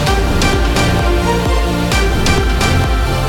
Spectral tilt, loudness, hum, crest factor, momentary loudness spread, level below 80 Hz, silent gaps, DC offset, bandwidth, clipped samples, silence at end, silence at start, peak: -5 dB/octave; -14 LUFS; none; 12 dB; 2 LU; -16 dBFS; none; under 0.1%; 17 kHz; under 0.1%; 0 s; 0 s; 0 dBFS